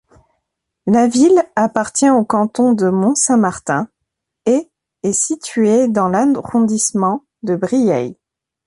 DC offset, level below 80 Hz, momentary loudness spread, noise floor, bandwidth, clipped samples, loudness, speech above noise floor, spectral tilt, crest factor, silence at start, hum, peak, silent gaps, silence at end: under 0.1%; -56 dBFS; 8 LU; -77 dBFS; 11.5 kHz; under 0.1%; -15 LUFS; 63 dB; -5 dB/octave; 16 dB; 0.85 s; none; 0 dBFS; none; 0.55 s